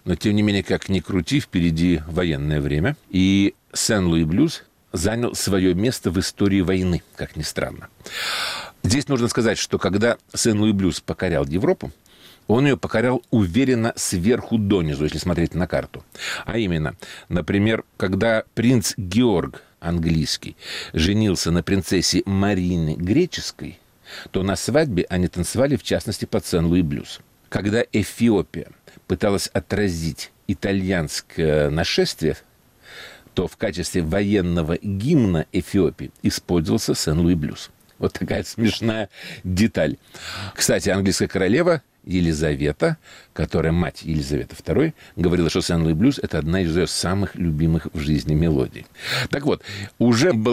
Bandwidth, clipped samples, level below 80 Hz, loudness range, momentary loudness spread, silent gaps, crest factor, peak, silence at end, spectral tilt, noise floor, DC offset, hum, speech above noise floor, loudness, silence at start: 16 kHz; under 0.1%; -40 dBFS; 3 LU; 10 LU; none; 14 dB; -8 dBFS; 0 s; -5.5 dB/octave; -47 dBFS; under 0.1%; none; 26 dB; -21 LUFS; 0.05 s